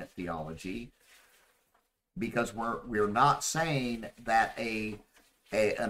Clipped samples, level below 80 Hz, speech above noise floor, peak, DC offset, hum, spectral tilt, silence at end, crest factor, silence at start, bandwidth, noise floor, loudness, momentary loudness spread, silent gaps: under 0.1%; -56 dBFS; 43 dB; -12 dBFS; under 0.1%; none; -4.5 dB/octave; 0 s; 22 dB; 0 s; 16 kHz; -74 dBFS; -31 LUFS; 15 LU; none